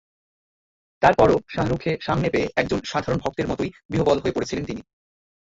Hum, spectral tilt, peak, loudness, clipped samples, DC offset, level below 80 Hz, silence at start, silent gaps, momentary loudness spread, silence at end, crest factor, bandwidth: none; -6 dB/octave; -2 dBFS; -22 LUFS; under 0.1%; under 0.1%; -44 dBFS; 1 s; 3.85-3.89 s; 10 LU; 0.6 s; 20 dB; 8 kHz